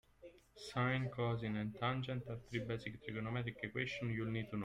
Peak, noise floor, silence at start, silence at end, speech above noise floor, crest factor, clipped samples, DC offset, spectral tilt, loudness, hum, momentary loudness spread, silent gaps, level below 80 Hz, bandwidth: -24 dBFS; -62 dBFS; 0.2 s; 0 s; 21 dB; 18 dB; under 0.1%; under 0.1%; -7 dB/octave; -41 LUFS; none; 8 LU; none; -66 dBFS; 10.5 kHz